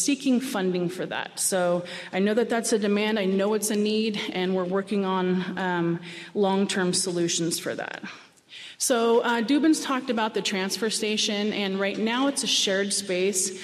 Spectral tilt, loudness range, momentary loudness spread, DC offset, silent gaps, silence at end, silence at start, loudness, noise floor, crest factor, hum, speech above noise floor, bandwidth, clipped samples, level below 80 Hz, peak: -3.5 dB/octave; 2 LU; 7 LU; under 0.1%; none; 0 s; 0 s; -25 LUFS; -45 dBFS; 14 dB; none; 20 dB; 14.5 kHz; under 0.1%; -74 dBFS; -12 dBFS